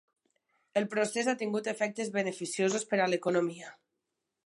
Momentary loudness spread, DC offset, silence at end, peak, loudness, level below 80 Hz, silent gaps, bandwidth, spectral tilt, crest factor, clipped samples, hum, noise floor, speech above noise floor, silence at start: 6 LU; under 0.1%; 0.7 s; -16 dBFS; -31 LUFS; -84 dBFS; none; 11.5 kHz; -4 dB/octave; 18 dB; under 0.1%; none; -85 dBFS; 54 dB; 0.75 s